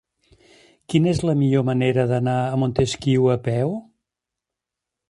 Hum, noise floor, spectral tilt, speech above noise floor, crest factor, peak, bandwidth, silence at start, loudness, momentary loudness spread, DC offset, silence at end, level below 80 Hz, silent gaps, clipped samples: none; -85 dBFS; -7 dB/octave; 66 dB; 18 dB; -4 dBFS; 11.5 kHz; 0.9 s; -21 LUFS; 4 LU; under 0.1%; 1.3 s; -50 dBFS; none; under 0.1%